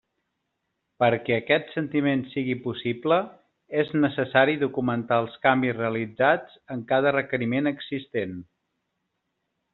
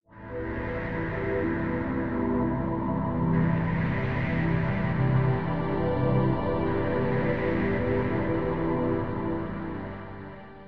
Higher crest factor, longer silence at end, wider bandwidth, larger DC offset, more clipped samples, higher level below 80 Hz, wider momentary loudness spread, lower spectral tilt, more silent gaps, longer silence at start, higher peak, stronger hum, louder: first, 22 dB vs 16 dB; first, 1.3 s vs 0 s; second, 4.3 kHz vs 5.2 kHz; second, under 0.1% vs 0.6%; neither; second, -68 dBFS vs -42 dBFS; about the same, 9 LU vs 9 LU; second, -4.5 dB/octave vs -10.5 dB/octave; neither; first, 1 s vs 0 s; first, -4 dBFS vs -12 dBFS; neither; first, -25 LUFS vs -28 LUFS